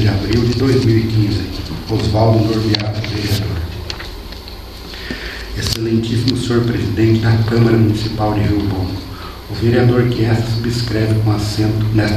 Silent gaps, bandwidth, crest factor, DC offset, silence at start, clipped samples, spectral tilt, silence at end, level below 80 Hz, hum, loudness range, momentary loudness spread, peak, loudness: none; 14 kHz; 16 dB; under 0.1%; 0 s; under 0.1%; -6.5 dB/octave; 0 s; -30 dBFS; none; 6 LU; 14 LU; 0 dBFS; -16 LUFS